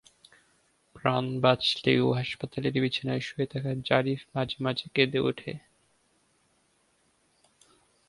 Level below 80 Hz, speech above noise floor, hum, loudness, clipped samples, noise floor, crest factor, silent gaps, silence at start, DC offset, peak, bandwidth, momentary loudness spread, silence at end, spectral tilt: -62 dBFS; 42 dB; none; -28 LUFS; under 0.1%; -69 dBFS; 24 dB; none; 0.95 s; under 0.1%; -6 dBFS; 11.5 kHz; 8 LU; 2.5 s; -6.5 dB/octave